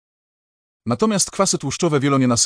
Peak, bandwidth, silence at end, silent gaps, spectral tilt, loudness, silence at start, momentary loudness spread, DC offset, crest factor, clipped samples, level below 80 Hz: -4 dBFS; 10.5 kHz; 0 s; none; -4 dB/octave; -19 LUFS; 0.85 s; 6 LU; under 0.1%; 16 dB; under 0.1%; -54 dBFS